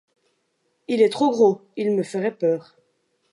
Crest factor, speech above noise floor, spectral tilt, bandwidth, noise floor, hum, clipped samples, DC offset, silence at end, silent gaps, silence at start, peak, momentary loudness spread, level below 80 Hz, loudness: 18 dB; 50 dB; -6 dB/octave; 11.5 kHz; -71 dBFS; none; under 0.1%; under 0.1%; 0.7 s; none; 0.9 s; -6 dBFS; 10 LU; -80 dBFS; -21 LUFS